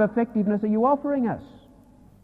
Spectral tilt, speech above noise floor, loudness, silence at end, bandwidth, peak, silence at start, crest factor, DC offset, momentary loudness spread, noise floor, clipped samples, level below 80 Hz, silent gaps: -10.5 dB/octave; 29 dB; -24 LUFS; 0.75 s; 4.1 kHz; -10 dBFS; 0 s; 16 dB; under 0.1%; 6 LU; -52 dBFS; under 0.1%; -58 dBFS; none